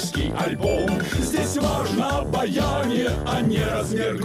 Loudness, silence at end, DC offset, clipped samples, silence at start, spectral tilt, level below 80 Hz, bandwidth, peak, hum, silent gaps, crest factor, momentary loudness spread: -23 LUFS; 0 s; under 0.1%; under 0.1%; 0 s; -5 dB/octave; -36 dBFS; 16 kHz; -10 dBFS; none; none; 12 dB; 2 LU